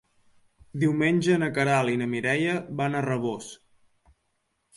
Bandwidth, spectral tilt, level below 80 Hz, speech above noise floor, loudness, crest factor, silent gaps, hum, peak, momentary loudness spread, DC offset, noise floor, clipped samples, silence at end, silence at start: 11.5 kHz; -6 dB/octave; -66 dBFS; 50 dB; -25 LUFS; 18 dB; none; none; -10 dBFS; 9 LU; under 0.1%; -75 dBFS; under 0.1%; 1.2 s; 0.75 s